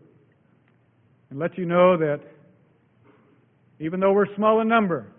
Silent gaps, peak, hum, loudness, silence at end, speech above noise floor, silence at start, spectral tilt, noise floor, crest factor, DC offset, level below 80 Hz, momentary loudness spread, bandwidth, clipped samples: none; -6 dBFS; none; -22 LUFS; 0.1 s; 40 dB; 1.3 s; -11.5 dB/octave; -61 dBFS; 20 dB; under 0.1%; -66 dBFS; 13 LU; 3.7 kHz; under 0.1%